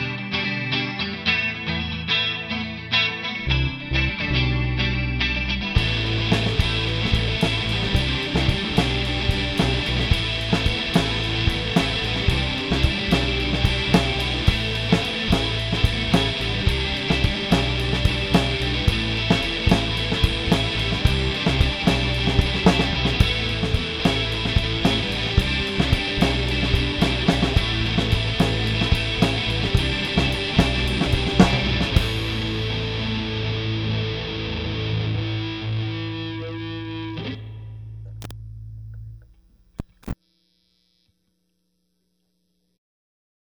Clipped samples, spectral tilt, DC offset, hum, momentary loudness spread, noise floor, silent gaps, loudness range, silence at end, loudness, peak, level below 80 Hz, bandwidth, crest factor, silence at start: under 0.1%; -5.5 dB/octave; under 0.1%; none; 8 LU; -72 dBFS; none; 8 LU; 3.3 s; -22 LUFS; 0 dBFS; -30 dBFS; 14.5 kHz; 22 dB; 0 s